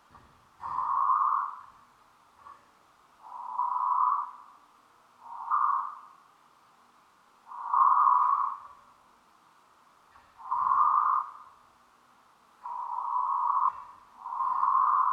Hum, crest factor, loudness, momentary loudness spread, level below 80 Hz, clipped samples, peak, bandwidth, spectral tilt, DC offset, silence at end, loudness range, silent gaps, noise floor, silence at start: none; 18 dB; -27 LUFS; 22 LU; -78 dBFS; under 0.1%; -12 dBFS; 6.6 kHz; -3 dB/octave; under 0.1%; 0 s; 5 LU; none; -62 dBFS; 0.15 s